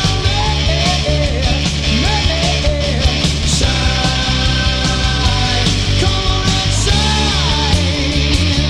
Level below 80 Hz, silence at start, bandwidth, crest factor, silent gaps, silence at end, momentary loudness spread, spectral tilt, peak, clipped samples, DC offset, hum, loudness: -18 dBFS; 0 s; 12 kHz; 14 dB; none; 0 s; 2 LU; -4 dB/octave; 0 dBFS; under 0.1%; under 0.1%; none; -14 LUFS